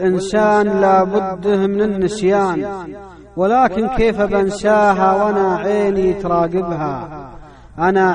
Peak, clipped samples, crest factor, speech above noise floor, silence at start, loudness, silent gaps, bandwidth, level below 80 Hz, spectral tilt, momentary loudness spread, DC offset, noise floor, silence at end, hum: -2 dBFS; under 0.1%; 14 dB; 22 dB; 0 s; -16 LUFS; none; 10 kHz; -38 dBFS; -6.5 dB/octave; 12 LU; under 0.1%; -37 dBFS; 0 s; none